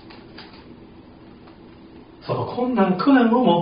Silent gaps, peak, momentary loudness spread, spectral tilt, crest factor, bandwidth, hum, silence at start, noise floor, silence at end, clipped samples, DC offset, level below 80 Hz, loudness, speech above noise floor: none; -6 dBFS; 26 LU; -5.5 dB/octave; 16 dB; 5.2 kHz; none; 0.05 s; -44 dBFS; 0 s; under 0.1%; under 0.1%; -56 dBFS; -19 LUFS; 27 dB